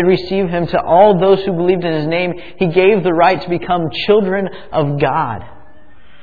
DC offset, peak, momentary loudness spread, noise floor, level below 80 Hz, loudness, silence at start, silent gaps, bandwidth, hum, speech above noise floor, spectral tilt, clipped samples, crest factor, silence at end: 2%; 0 dBFS; 9 LU; -47 dBFS; -44 dBFS; -14 LUFS; 0 s; none; 4.9 kHz; none; 33 dB; -9 dB/octave; under 0.1%; 14 dB; 0.75 s